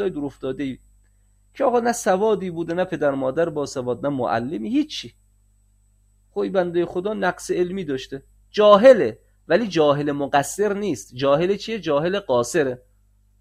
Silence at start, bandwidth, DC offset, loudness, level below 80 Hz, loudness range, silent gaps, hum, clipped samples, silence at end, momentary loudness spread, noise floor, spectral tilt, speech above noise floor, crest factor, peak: 0 s; 15 kHz; under 0.1%; -21 LUFS; -54 dBFS; 8 LU; none; 50 Hz at -50 dBFS; under 0.1%; 0.65 s; 11 LU; -59 dBFS; -5 dB/octave; 38 dB; 22 dB; 0 dBFS